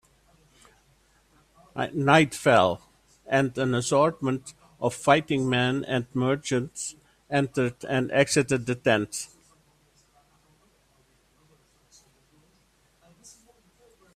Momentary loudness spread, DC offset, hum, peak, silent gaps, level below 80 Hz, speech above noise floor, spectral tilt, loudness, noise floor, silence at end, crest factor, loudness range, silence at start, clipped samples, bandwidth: 13 LU; under 0.1%; none; -2 dBFS; none; -62 dBFS; 40 dB; -5 dB/octave; -25 LUFS; -64 dBFS; 4.9 s; 24 dB; 5 LU; 1.75 s; under 0.1%; 14.5 kHz